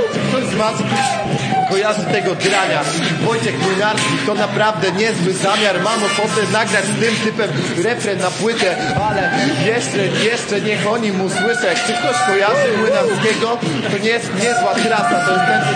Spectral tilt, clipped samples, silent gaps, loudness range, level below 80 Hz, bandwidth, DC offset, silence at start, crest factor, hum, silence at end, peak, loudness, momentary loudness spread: -4 dB/octave; under 0.1%; none; 1 LU; -54 dBFS; 9.8 kHz; under 0.1%; 0 s; 14 dB; none; 0 s; -2 dBFS; -16 LUFS; 3 LU